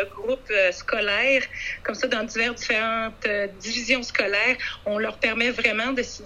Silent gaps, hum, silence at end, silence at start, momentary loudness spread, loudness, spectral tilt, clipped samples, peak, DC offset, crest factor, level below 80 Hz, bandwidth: none; none; 0 s; 0 s; 7 LU; -23 LUFS; -2.5 dB/octave; under 0.1%; -4 dBFS; under 0.1%; 20 dB; -50 dBFS; 11.5 kHz